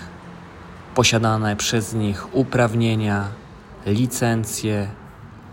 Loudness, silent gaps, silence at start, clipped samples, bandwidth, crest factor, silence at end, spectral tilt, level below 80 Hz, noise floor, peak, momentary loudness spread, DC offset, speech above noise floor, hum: -21 LUFS; none; 0 s; under 0.1%; 16.5 kHz; 20 dB; 0 s; -4.5 dB/octave; -48 dBFS; -40 dBFS; -2 dBFS; 22 LU; under 0.1%; 20 dB; none